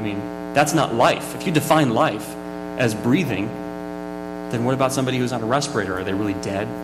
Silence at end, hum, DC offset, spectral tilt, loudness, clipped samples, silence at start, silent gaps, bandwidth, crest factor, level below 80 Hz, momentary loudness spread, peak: 0 s; none; under 0.1%; -5 dB/octave; -22 LUFS; under 0.1%; 0 s; none; 15.5 kHz; 16 dB; -50 dBFS; 13 LU; -6 dBFS